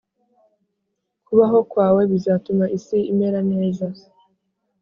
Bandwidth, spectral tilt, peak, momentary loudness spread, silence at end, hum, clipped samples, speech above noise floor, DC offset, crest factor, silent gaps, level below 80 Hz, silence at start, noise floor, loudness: 7 kHz; -9 dB/octave; -2 dBFS; 7 LU; 0.9 s; none; under 0.1%; 58 dB; under 0.1%; 18 dB; none; -60 dBFS; 1.3 s; -76 dBFS; -19 LUFS